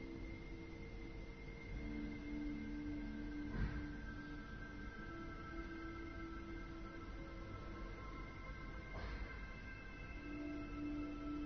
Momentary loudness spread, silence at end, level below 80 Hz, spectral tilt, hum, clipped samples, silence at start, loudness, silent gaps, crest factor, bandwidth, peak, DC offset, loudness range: 6 LU; 0 s; -52 dBFS; -6 dB/octave; none; under 0.1%; 0 s; -50 LUFS; none; 18 dB; 6.4 kHz; -30 dBFS; under 0.1%; 4 LU